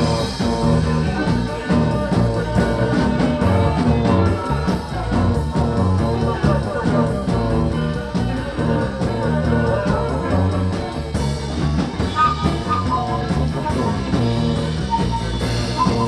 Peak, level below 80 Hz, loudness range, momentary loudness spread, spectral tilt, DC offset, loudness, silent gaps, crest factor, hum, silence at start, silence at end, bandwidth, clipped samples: -4 dBFS; -28 dBFS; 2 LU; 5 LU; -7 dB/octave; under 0.1%; -19 LUFS; none; 14 dB; none; 0 s; 0 s; 12 kHz; under 0.1%